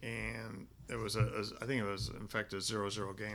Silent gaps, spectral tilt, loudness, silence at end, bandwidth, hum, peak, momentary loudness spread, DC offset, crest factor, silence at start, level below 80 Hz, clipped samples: none; -4.5 dB/octave; -39 LUFS; 0 s; 19 kHz; none; -22 dBFS; 10 LU; under 0.1%; 18 dB; 0 s; -56 dBFS; under 0.1%